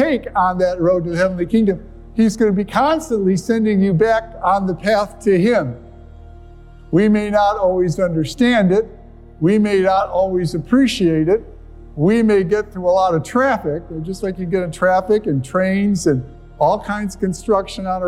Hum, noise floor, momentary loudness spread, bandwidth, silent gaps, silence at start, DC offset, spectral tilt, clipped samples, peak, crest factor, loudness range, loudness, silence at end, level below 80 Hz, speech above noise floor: none; -39 dBFS; 8 LU; 13 kHz; none; 0 s; under 0.1%; -6.5 dB/octave; under 0.1%; -2 dBFS; 16 dB; 2 LU; -17 LUFS; 0 s; -40 dBFS; 23 dB